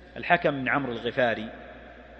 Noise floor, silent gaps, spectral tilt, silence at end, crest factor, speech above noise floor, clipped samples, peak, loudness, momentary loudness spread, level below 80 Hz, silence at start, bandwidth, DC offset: -46 dBFS; none; -7 dB/octave; 0 s; 24 dB; 20 dB; under 0.1%; -4 dBFS; -26 LUFS; 21 LU; -54 dBFS; 0 s; 6.4 kHz; under 0.1%